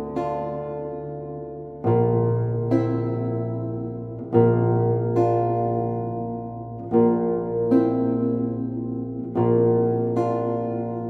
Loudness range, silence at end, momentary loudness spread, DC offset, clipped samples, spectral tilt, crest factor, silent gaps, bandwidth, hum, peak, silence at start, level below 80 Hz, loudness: 3 LU; 0 s; 12 LU; under 0.1%; under 0.1%; -11.5 dB/octave; 18 dB; none; 4.4 kHz; none; -4 dBFS; 0 s; -54 dBFS; -23 LUFS